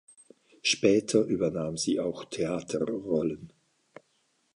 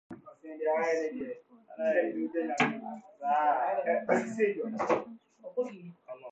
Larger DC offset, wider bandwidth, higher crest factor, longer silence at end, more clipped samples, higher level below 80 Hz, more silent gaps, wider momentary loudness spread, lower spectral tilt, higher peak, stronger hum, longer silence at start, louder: neither; first, 11.5 kHz vs 8.6 kHz; about the same, 20 dB vs 18 dB; first, 1.05 s vs 0 s; neither; first, -62 dBFS vs -78 dBFS; neither; second, 10 LU vs 19 LU; second, -4 dB/octave vs -5.5 dB/octave; first, -10 dBFS vs -14 dBFS; neither; first, 0.65 s vs 0.1 s; first, -28 LUFS vs -31 LUFS